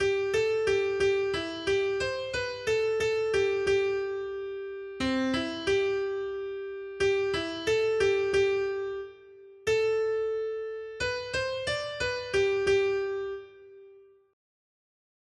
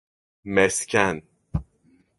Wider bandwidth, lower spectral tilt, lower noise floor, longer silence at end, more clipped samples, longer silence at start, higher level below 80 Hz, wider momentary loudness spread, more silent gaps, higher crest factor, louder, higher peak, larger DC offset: about the same, 11.5 kHz vs 12 kHz; about the same, -4 dB/octave vs -4 dB/octave; second, -55 dBFS vs -61 dBFS; first, 1.35 s vs 0.55 s; neither; second, 0 s vs 0.45 s; second, -56 dBFS vs -44 dBFS; second, 10 LU vs 14 LU; neither; second, 14 dB vs 24 dB; second, -29 LUFS vs -23 LUFS; second, -14 dBFS vs -2 dBFS; neither